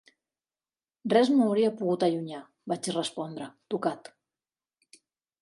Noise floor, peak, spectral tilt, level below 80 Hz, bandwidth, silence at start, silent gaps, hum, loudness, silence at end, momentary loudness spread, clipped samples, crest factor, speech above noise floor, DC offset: under -90 dBFS; -10 dBFS; -5.5 dB/octave; -80 dBFS; 11.5 kHz; 1.05 s; none; none; -28 LUFS; 1.45 s; 17 LU; under 0.1%; 20 dB; over 63 dB; under 0.1%